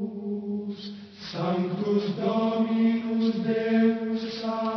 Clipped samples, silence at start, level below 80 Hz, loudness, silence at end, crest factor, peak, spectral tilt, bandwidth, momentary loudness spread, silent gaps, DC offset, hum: under 0.1%; 0 s; -70 dBFS; -26 LUFS; 0 s; 16 dB; -12 dBFS; -8 dB/octave; 6.2 kHz; 12 LU; none; under 0.1%; none